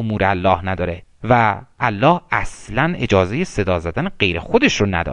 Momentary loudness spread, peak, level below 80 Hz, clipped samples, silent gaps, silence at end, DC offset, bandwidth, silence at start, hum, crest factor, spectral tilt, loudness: 8 LU; 0 dBFS; -38 dBFS; under 0.1%; none; 0 s; under 0.1%; 10.5 kHz; 0 s; none; 18 dB; -5.5 dB/octave; -18 LUFS